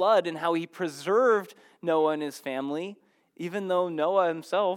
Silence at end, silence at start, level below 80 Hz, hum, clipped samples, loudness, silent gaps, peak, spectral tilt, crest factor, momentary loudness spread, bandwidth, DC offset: 0 s; 0 s; under -90 dBFS; none; under 0.1%; -27 LUFS; none; -12 dBFS; -5.5 dB/octave; 16 dB; 11 LU; 16.5 kHz; under 0.1%